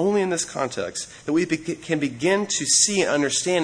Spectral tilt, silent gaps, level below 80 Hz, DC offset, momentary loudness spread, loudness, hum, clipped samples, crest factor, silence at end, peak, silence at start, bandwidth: -2.5 dB/octave; none; -62 dBFS; under 0.1%; 10 LU; -22 LUFS; none; under 0.1%; 16 dB; 0 s; -6 dBFS; 0 s; 10.5 kHz